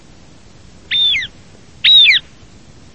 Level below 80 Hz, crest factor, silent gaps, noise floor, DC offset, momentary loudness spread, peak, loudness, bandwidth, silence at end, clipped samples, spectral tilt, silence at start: -48 dBFS; 14 dB; none; -43 dBFS; 0.6%; 12 LU; 0 dBFS; -9 LUFS; 8.6 kHz; 0.75 s; under 0.1%; 0 dB/octave; 0.9 s